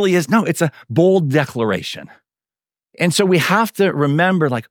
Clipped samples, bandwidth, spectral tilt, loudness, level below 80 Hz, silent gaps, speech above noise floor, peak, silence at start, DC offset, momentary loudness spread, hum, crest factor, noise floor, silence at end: under 0.1%; 19.5 kHz; -5.5 dB/octave; -16 LUFS; -64 dBFS; none; over 74 dB; -2 dBFS; 0 s; under 0.1%; 6 LU; none; 16 dB; under -90 dBFS; 0.1 s